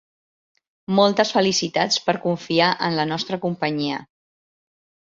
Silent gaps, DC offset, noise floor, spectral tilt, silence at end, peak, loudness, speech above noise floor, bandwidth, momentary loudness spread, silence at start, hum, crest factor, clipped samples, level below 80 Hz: none; under 0.1%; under -90 dBFS; -4 dB/octave; 1.1 s; -2 dBFS; -21 LUFS; over 69 dB; 7.8 kHz; 8 LU; 0.9 s; none; 20 dB; under 0.1%; -64 dBFS